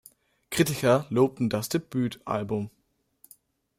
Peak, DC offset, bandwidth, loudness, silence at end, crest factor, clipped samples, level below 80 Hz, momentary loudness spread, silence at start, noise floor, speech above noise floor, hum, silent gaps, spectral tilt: -10 dBFS; under 0.1%; 16 kHz; -27 LUFS; 1.1 s; 18 dB; under 0.1%; -62 dBFS; 10 LU; 0.5 s; -62 dBFS; 36 dB; none; none; -5.5 dB/octave